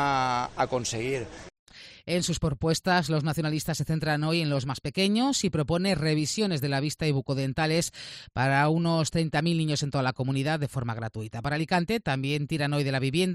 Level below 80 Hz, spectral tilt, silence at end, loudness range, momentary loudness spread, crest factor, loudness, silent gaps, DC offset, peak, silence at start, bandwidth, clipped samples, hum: -52 dBFS; -5 dB/octave; 0 s; 2 LU; 7 LU; 16 dB; -27 LUFS; 1.59-1.66 s; under 0.1%; -10 dBFS; 0 s; 14 kHz; under 0.1%; none